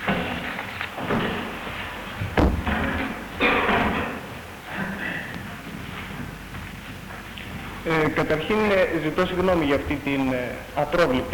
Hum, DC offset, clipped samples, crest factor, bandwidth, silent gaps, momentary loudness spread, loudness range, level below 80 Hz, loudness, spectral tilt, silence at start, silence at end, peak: none; under 0.1%; under 0.1%; 20 dB; 19 kHz; none; 14 LU; 10 LU; -38 dBFS; -25 LUFS; -6 dB/octave; 0 s; 0 s; -4 dBFS